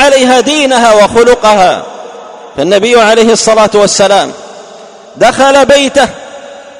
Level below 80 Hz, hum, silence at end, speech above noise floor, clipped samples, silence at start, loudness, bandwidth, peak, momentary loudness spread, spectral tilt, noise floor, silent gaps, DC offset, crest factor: -38 dBFS; none; 0 s; 25 dB; 4%; 0 s; -6 LUFS; 15.5 kHz; 0 dBFS; 20 LU; -2.5 dB/octave; -31 dBFS; none; under 0.1%; 8 dB